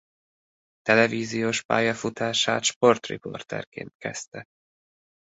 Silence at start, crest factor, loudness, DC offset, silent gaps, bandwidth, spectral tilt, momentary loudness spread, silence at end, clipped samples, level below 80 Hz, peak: 0.85 s; 22 dB; -24 LUFS; under 0.1%; 1.65-1.69 s, 2.76-2.81 s, 3.67-3.72 s, 3.95-4.00 s, 4.28-4.32 s; 8.2 kHz; -3.5 dB/octave; 15 LU; 1 s; under 0.1%; -66 dBFS; -4 dBFS